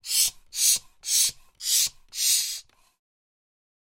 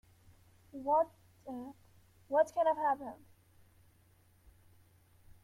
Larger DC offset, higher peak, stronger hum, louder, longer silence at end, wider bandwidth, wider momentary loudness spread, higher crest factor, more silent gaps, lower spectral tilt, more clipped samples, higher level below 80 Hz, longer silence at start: neither; first, -8 dBFS vs -18 dBFS; neither; first, -23 LUFS vs -34 LUFS; first, 1.4 s vs 0.1 s; about the same, 16.5 kHz vs 15.5 kHz; second, 8 LU vs 21 LU; about the same, 20 dB vs 20 dB; neither; second, 4.5 dB/octave vs -5.5 dB/octave; neither; first, -62 dBFS vs -70 dBFS; second, 0.05 s vs 0.75 s